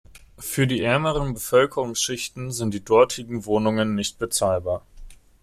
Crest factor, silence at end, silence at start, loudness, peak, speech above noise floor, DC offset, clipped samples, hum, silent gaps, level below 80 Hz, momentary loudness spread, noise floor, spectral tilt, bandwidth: 18 dB; 0.25 s; 0.15 s; -23 LUFS; -4 dBFS; 20 dB; under 0.1%; under 0.1%; none; none; -46 dBFS; 10 LU; -43 dBFS; -4.5 dB/octave; 16 kHz